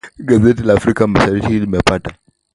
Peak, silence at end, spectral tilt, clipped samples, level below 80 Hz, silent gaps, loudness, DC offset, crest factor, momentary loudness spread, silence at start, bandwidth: 0 dBFS; 0.4 s; -6.5 dB/octave; under 0.1%; -34 dBFS; none; -14 LUFS; under 0.1%; 14 dB; 5 LU; 0.05 s; 11.5 kHz